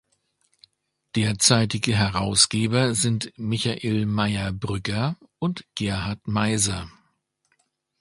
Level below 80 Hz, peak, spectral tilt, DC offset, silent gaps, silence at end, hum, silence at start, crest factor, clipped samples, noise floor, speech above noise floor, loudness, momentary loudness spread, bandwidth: -48 dBFS; 0 dBFS; -4 dB/octave; under 0.1%; none; 1.1 s; none; 1.15 s; 24 dB; under 0.1%; -71 dBFS; 48 dB; -23 LUFS; 11 LU; 11.5 kHz